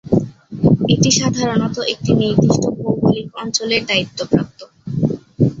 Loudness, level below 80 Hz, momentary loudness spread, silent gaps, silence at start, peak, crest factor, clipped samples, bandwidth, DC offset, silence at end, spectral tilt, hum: -17 LUFS; -42 dBFS; 7 LU; none; 0.05 s; 0 dBFS; 16 dB; under 0.1%; 8 kHz; under 0.1%; 0 s; -5 dB/octave; none